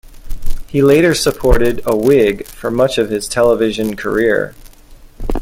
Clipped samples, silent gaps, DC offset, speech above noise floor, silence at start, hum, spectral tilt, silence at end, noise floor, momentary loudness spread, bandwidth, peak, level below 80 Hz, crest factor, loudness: under 0.1%; none; under 0.1%; 26 dB; 0.1 s; none; -5 dB/octave; 0 s; -39 dBFS; 15 LU; 16.5 kHz; 0 dBFS; -24 dBFS; 12 dB; -14 LUFS